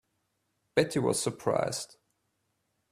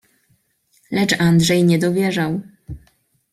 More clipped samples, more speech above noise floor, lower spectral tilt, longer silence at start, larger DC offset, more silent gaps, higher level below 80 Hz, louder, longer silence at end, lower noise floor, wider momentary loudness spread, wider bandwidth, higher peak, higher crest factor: neither; about the same, 49 dB vs 47 dB; about the same, -4.5 dB/octave vs -5.5 dB/octave; second, 0.75 s vs 0.9 s; neither; neither; second, -66 dBFS vs -48 dBFS; second, -30 LUFS vs -17 LUFS; first, 1.05 s vs 0.55 s; first, -78 dBFS vs -63 dBFS; second, 8 LU vs 24 LU; about the same, 14.5 kHz vs 15 kHz; second, -8 dBFS vs -2 dBFS; first, 24 dB vs 16 dB